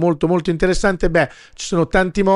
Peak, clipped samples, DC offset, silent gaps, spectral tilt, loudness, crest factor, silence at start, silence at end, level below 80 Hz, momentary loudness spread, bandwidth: -2 dBFS; under 0.1%; under 0.1%; none; -6 dB/octave; -18 LUFS; 14 dB; 0 s; 0 s; -30 dBFS; 6 LU; 11 kHz